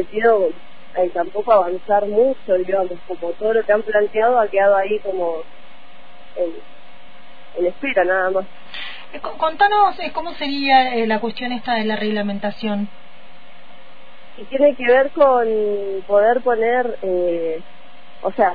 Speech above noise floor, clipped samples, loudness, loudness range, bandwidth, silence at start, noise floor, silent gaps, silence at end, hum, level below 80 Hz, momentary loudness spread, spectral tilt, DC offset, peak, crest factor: 28 dB; under 0.1%; -18 LUFS; 6 LU; 5 kHz; 0 s; -46 dBFS; none; 0 s; none; -54 dBFS; 13 LU; -7.5 dB/octave; 4%; -4 dBFS; 16 dB